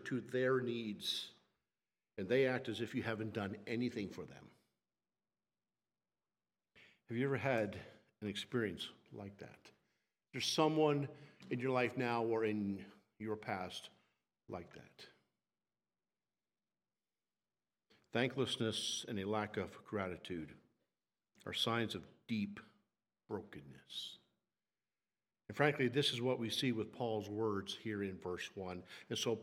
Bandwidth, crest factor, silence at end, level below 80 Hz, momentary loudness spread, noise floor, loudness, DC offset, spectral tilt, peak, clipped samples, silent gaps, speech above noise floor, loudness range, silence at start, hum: 16 kHz; 26 dB; 0 s; -82 dBFS; 18 LU; under -90 dBFS; -39 LUFS; under 0.1%; -5 dB/octave; -16 dBFS; under 0.1%; none; over 50 dB; 11 LU; 0 s; none